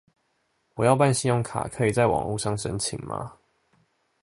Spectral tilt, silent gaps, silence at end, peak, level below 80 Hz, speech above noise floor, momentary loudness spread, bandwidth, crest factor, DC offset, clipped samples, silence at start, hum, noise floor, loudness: -5 dB/octave; none; 0.9 s; -4 dBFS; -52 dBFS; 48 dB; 14 LU; 11.5 kHz; 22 dB; under 0.1%; under 0.1%; 0.75 s; none; -72 dBFS; -25 LUFS